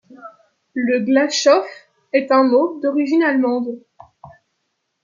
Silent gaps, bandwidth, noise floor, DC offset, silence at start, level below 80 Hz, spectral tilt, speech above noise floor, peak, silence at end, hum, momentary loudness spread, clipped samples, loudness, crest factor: none; 7.6 kHz; -72 dBFS; under 0.1%; 0.1 s; -70 dBFS; -3.5 dB/octave; 56 dB; -2 dBFS; 0.75 s; none; 13 LU; under 0.1%; -17 LUFS; 16 dB